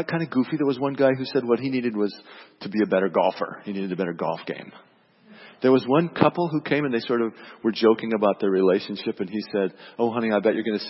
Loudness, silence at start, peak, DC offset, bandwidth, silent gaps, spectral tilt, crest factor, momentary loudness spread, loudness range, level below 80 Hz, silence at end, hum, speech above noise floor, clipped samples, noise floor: -24 LUFS; 0 s; -2 dBFS; under 0.1%; 6 kHz; none; -10 dB/octave; 22 dB; 10 LU; 4 LU; -70 dBFS; 0 s; none; 29 dB; under 0.1%; -52 dBFS